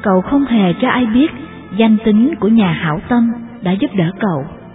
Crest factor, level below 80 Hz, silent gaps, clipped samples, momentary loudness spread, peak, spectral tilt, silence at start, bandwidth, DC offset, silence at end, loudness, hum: 14 dB; -44 dBFS; none; under 0.1%; 7 LU; 0 dBFS; -11 dB/octave; 0 s; 4 kHz; under 0.1%; 0 s; -14 LUFS; none